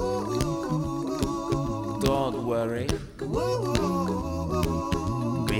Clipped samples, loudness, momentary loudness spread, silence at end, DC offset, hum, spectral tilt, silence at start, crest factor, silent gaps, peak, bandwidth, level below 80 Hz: under 0.1%; -28 LUFS; 4 LU; 0 s; under 0.1%; none; -6.5 dB/octave; 0 s; 22 dB; none; -6 dBFS; 18.5 kHz; -40 dBFS